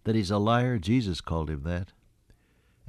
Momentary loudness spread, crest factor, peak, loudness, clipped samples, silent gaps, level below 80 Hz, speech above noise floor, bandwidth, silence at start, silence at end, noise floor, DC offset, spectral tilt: 10 LU; 16 dB; -12 dBFS; -28 LUFS; under 0.1%; none; -44 dBFS; 38 dB; 12 kHz; 0.05 s; 1.05 s; -65 dBFS; under 0.1%; -7 dB/octave